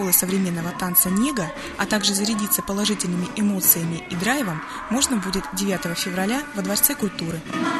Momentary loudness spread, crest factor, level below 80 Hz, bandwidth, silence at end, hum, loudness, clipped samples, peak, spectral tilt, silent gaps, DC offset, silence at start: 10 LU; 20 dB; -48 dBFS; 13 kHz; 0 s; none; -21 LUFS; under 0.1%; -2 dBFS; -3.5 dB/octave; none; under 0.1%; 0 s